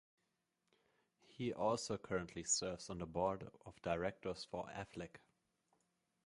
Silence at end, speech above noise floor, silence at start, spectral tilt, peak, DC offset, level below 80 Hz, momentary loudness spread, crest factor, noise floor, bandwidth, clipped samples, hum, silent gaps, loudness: 1.1 s; 43 dB; 1.3 s; -3.5 dB/octave; -24 dBFS; under 0.1%; -68 dBFS; 11 LU; 22 dB; -86 dBFS; 11.5 kHz; under 0.1%; none; none; -43 LUFS